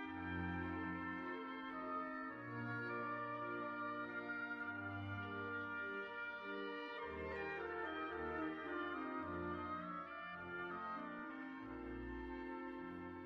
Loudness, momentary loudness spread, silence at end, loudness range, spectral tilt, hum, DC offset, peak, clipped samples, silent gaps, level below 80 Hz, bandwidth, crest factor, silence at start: -46 LUFS; 5 LU; 0 s; 2 LU; -4.5 dB/octave; none; under 0.1%; -32 dBFS; under 0.1%; none; -66 dBFS; 6.8 kHz; 14 dB; 0 s